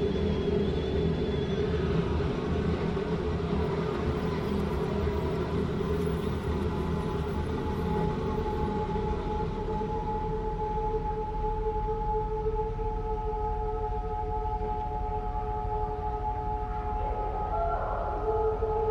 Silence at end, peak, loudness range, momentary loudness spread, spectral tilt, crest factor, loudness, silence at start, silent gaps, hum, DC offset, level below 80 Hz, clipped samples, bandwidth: 0 s; -16 dBFS; 3 LU; 4 LU; -8 dB/octave; 14 dB; -31 LUFS; 0 s; none; none; under 0.1%; -36 dBFS; under 0.1%; 17 kHz